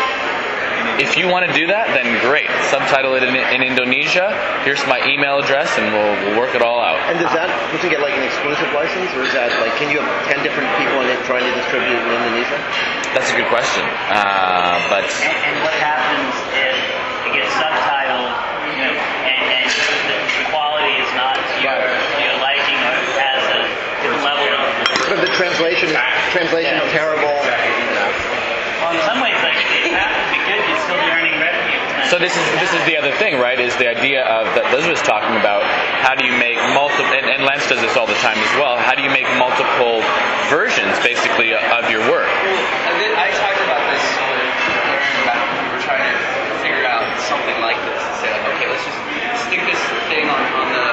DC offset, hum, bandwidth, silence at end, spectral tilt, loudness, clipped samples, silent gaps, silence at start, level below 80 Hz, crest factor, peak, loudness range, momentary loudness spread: under 0.1%; none; 8.2 kHz; 0 s; -2.5 dB/octave; -15 LUFS; under 0.1%; none; 0 s; -54 dBFS; 16 dB; 0 dBFS; 2 LU; 4 LU